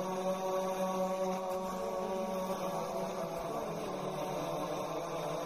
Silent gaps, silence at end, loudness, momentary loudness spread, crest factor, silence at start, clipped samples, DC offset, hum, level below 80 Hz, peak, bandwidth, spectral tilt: none; 0 s; -37 LUFS; 4 LU; 12 dB; 0 s; under 0.1%; under 0.1%; none; -64 dBFS; -24 dBFS; 15.5 kHz; -5 dB/octave